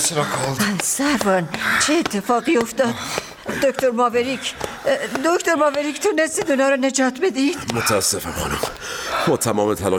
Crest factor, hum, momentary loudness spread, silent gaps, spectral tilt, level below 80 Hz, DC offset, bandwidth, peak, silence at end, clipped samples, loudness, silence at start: 20 dB; none; 7 LU; none; -3.5 dB/octave; -48 dBFS; under 0.1%; 18.5 kHz; 0 dBFS; 0 s; under 0.1%; -20 LUFS; 0 s